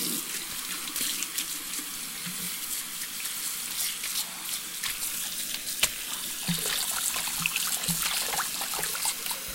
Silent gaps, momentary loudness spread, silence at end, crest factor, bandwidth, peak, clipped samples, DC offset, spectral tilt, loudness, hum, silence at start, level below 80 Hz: none; 6 LU; 0 s; 24 dB; 17 kHz; -6 dBFS; under 0.1%; under 0.1%; -0.5 dB/octave; -29 LUFS; none; 0 s; -58 dBFS